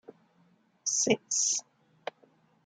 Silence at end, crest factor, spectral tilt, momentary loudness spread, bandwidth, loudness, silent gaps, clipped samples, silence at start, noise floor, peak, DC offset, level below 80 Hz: 1.05 s; 22 dB; -1.5 dB/octave; 18 LU; 11 kHz; -28 LUFS; none; under 0.1%; 0.85 s; -67 dBFS; -12 dBFS; under 0.1%; -80 dBFS